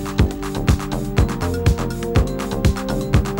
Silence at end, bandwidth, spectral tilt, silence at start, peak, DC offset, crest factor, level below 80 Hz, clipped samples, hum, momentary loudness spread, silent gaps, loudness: 0 s; 16.5 kHz; -6.5 dB/octave; 0 s; -2 dBFS; under 0.1%; 18 dB; -24 dBFS; under 0.1%; none; 3 LU; none; -21 LUFS